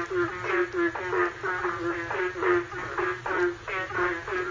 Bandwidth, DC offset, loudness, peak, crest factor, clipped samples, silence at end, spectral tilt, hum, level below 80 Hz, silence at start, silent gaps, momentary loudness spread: 7.6 kHz; under 0.1%; -28 LUFS; -10 dBFS; 18 dB; under 0.1%; 0 s; -5.5 dB/octave; none; -54 dBFS; 0 s; none; 4 LU